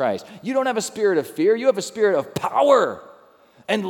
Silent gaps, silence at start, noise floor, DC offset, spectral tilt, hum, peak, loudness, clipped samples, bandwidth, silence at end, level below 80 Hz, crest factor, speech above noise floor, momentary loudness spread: none; 0 s; -52 dBFS; under 0.1%; -4.5 dB/octave; none; -2 dBFS; -20 LUFS; under 0.1%; 17.5 kHz; 0 s; -70 dBFS; 18 dB; 32 dB; 9 LU